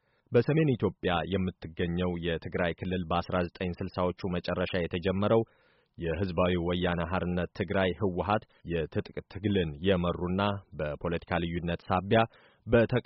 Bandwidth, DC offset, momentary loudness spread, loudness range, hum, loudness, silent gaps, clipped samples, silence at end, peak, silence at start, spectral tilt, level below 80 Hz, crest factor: 5.8 kHz; under 0.1%; 8 LU; 2 LU; none; -30 LUFS; none; under 0.1%; 0.05 s; -12 dBFS; 0.3 s; -5.5 dB/octave; -50 dBFS; 18 dB